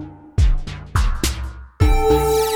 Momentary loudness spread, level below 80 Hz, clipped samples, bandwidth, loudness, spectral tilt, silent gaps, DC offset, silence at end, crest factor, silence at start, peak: 12 LU; -20 dBFS; under 0.1%; over 20 kHz; -20 LUFS; -5.5 dB/octave; none; under 0.1%; 0 s; 16 dB; 0 s; -2 dBFS